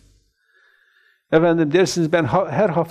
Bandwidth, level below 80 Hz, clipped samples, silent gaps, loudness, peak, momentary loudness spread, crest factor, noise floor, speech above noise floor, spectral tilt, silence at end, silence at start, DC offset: 14.5 kHz; -54 dBFS; under 0.1%; none; -18 LUFS; -4 dBFS; 3 LU; 16 dB; -60 dBFS; 43 dB; -6 dB/octave; 0 s; 1.3 s; under 0.1%